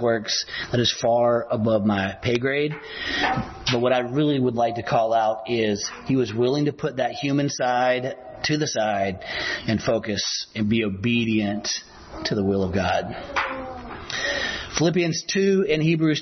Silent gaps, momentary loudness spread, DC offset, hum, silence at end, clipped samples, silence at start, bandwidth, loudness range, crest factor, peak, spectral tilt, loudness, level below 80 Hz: none; 7 LU; under 0.1%; none; 0 s; under 0.1%; 0 s; 6.4 kHz; 2 LU; 14 dB; -8 dBFS; -4.5 dB/octave; -23 LUFS; -50 dBFS